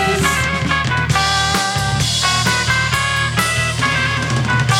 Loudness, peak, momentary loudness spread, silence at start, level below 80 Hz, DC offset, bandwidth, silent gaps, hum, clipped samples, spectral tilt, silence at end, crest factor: -15 LUFS; -2 dBFS; 3 LU; 0 s; -32 dBFS; under 0.1%; 17.5 kHz; none; none; under 0.1%; -3 dB/octave; 0 s; 14 dB